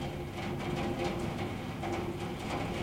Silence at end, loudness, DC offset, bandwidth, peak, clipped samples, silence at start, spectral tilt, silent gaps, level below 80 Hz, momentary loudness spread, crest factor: 0 s; -36 LUFS; under 0.1%; 16 kHz; -20 dBFS; under 0.1%; 0 s; -6 dB/octave; none; -50 dBFS; 4 LU; 16 dB